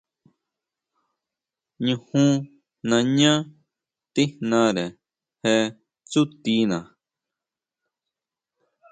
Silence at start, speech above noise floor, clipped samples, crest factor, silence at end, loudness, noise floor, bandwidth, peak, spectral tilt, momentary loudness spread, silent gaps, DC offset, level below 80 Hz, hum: 1.8 s; 67 dB; under 0.1%; 20 dB; 2.1 s; -23 LUFS; -88 dBFS; 9.4 kHz; -6 dBFS; -5 dB/octave; 11 LU; none; under 0.1%; -66 dBFS; none